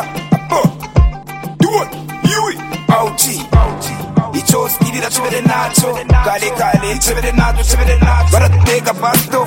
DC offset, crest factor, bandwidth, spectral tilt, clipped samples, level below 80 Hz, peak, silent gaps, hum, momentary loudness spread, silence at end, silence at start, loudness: under 0.1%; 12 dB; 17 kHz; -4.5 dB/octave; under 0.1%; -18 dBFS; 0 dBFS; none; none; 6 LU; 0 s; 0 s; -13 LUFS